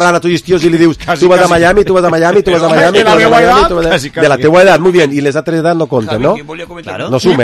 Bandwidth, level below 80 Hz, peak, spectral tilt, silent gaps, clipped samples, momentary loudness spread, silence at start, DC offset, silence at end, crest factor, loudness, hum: 14 kHz; -34 dBFS; 0 dBFS; -5.5 dB/octave; none; 0.6%; 8 LU; 0 s; under 0.1%; 0 s; 8 dB; -8 LUFS; none